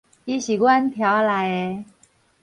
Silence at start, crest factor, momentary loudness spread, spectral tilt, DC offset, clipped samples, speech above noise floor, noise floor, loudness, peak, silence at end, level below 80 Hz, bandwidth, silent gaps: 0.25 s; 16 dB; 11 LU; -5 dB/octave; under 0.1%; under 0.1%; 39 dB; -59 dBFS; -20 LUFS; -6 dBFS; 0.6 s; -64 dBFS; 11 kHz; none